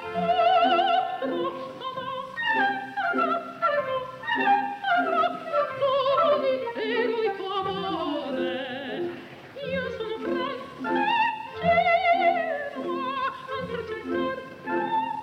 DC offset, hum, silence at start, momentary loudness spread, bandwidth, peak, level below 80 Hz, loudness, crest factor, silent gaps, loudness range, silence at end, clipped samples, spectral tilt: under 0.1%; none; 0 s; 11 LU; 9.6 kHz; -12 dBFS; -64 dBFS; -26 LUFS; 14 dB; none; 5 LU; 0 s; under 0.1%; -6 dB/octave